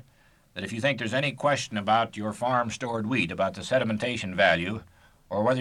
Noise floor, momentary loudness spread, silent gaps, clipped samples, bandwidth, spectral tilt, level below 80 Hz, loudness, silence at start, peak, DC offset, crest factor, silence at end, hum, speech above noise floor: -60 dBFS; 11 LU; none; under 0.1%; 13 kHz; -5 dB/octave; -60 dBFS; -27 LUFS; 0.55 s; -10 dBFS; under 0.1%; 18 dB; 0 s; none; 34 dB